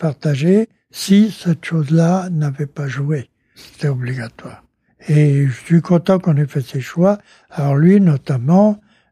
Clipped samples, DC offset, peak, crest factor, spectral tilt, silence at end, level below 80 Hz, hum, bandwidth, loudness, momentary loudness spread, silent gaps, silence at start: under 0.1%; under 0.1%; -2 dBFS; 14 dB; -8 dB/octave; 0.35 s; -60 dBFS; none; 14.5 kHz; -16 LUFS; 11 LU; none; 0 s